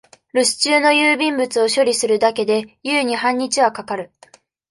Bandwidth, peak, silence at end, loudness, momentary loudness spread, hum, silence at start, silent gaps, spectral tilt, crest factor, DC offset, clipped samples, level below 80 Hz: 12 kHz; -2 dBFS; 0.65 s; -17 LUFS; 9 LU; none; 0.35 s; none; -2 dB/octave; 16 dB; under 0.1%; under 0.1%; -66 dBFS